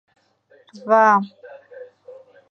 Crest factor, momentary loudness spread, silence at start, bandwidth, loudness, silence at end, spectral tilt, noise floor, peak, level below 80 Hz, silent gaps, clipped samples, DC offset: 20 dB; 27 LU; 0.85 s; 6.6 kHz; -16 LUFS; 0.4 s; -6.5 dB/octave; -56 dBFS; -2 dBFS; -82 dBFS; none; under 0.1%; under 0.1%